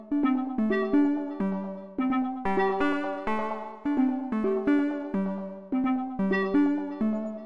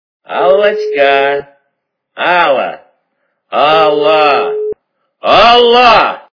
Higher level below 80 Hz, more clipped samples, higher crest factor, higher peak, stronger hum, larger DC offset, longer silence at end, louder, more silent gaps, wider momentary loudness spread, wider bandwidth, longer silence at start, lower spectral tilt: second, -58 dBFS vs -44 dBFS; second, under 0.1% vs 1%; about the same, 14 dB vs 10 dB; second, -14 dBFS vs 0 dBFS; neither; neither; second, 0 s vs 0.2 s; second, -28 LUFS vs -9 LUFS; neither; second, 7 LU vs 14 LU; first, 6.2 kHz vs 5.4 kHz; second, 0 s vs 0.3 s; first, -8.5 dB/octave vs -4 dB/octave